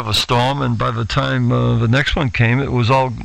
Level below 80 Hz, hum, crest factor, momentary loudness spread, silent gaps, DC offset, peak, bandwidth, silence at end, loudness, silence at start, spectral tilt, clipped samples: -32 dBFS; none; 14 dB; 3 LU; none; under 0.1%; -2 dBFS; 13 kHz; 0 s; -16 LUFS; 0 s; -6 dB/octave; under 0.1%